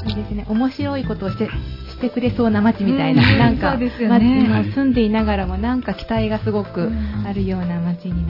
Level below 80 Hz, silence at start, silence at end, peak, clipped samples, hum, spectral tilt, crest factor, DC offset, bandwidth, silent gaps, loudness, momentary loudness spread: -32 dBFS; 0 s; 0 s; -4 dBFS; under 0.1%; none; -9 dB/octave; 14 dB; under 0.1%; 5.8 kHz; none; -19 LUFS; 10 LU